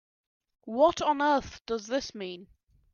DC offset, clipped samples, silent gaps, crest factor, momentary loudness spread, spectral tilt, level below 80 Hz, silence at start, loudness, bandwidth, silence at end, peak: under 0.1%; under 0.1%; 1.61-1.65 s; 18 dB; 16 LU; -4 dB/octave; -60 dBFS; 0.65 s; -28 LUFS; 7.2 kHz; 0.5 s; -12 dBFS